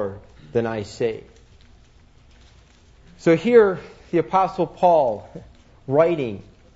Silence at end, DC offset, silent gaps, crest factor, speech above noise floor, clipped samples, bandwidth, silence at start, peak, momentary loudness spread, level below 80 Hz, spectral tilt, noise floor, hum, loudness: 0.35 s; under 0.1%; none; 20 dB; 32 dB; under 0.1%; 8 kHz; 0 s; -2 dBFS; 20 LU; -52 dBFS; -7 dB/octave; -51 dBFS; none; -20 LUFS